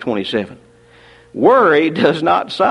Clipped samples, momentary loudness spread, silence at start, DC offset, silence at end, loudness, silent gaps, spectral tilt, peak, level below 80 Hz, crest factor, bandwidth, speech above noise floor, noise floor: under 0.1%; 13 LU; 0 s; under 0.1%; 0 s; -14 LUFS; none; -6.5 dB/octave; 0 dBFS; -56 dBFS; 16 dB; 11 kHz; 32 dB; -46 dBFS